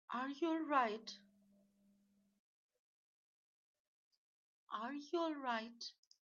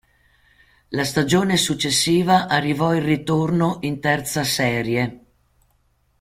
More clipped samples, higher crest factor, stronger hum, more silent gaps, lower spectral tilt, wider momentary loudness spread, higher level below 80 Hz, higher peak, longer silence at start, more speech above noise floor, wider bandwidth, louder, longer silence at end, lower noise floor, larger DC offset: neither; first, 24 dB vs 18 dB; neither; first, 2.39-2.69 s, 2.79-4.11 s, 4.17-4.67 s vs none; second, -1 dB/octave vs -4.5 dB/octave; first, 15 LU vs 6 LU; second, under -90 dBFS vs -52 dBFS; second, -22 dBFS vs -2 dBFS; second, 0.1 s vs 0.9 s; second, 36 dB vs 44 dB; second, 7.2 kHz vs 16.5 kHz; second, -41 LUFS vs -20 LUFS; second, 0.35 s vs 1.05 s; first, -77 dBFS vs -63 dBFS; neither